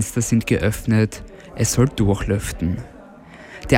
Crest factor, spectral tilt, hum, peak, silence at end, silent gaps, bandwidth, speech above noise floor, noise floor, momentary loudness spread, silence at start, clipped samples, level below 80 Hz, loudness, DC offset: 20 dB; -5.5 dB/octave; none; -2 dBFS; 0 s; none; 17 kHz; 22 dB; -42 dBFS; 19 LU; 0 s; under 0.1%; -36 dBFS; -20 LUFS; under 0.1%